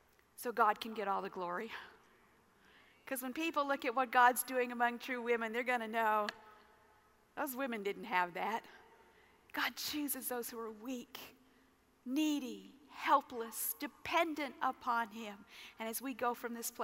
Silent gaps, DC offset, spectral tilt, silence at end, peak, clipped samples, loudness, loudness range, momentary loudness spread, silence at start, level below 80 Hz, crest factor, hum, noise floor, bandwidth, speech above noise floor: none; under 0.1%; -2.5 dB/octave; 0 s; -16 dBFS; under 0.1%; -37 LUFS; 7 LU; 15 LU; 0.4 s; -80 dBFS; 22 dB; none; -70 dBFS; 16 kHz; 32 dB